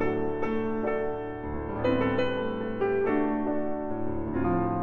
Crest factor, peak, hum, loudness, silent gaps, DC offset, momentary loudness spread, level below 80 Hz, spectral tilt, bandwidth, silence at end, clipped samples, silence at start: 14 dB; -14 dBFS; none; -29 LUFS; none; under 0.1%; 7 LU; -46 dBFS; -9 dB/octave; 7 kHz; 0 s; under 0.1%; 0 s